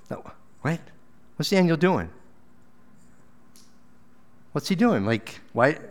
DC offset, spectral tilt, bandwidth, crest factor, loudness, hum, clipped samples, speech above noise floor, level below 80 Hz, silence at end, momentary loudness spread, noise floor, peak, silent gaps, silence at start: 0.5%; -6 dB/octave; 17 kHz; 24 dB; -24 LUFS; none; under 0.1%; 35 dB; -60 dBFS; 0 s; 17 LU; -58 dBFS; -4 dBFS; none; 0.1 s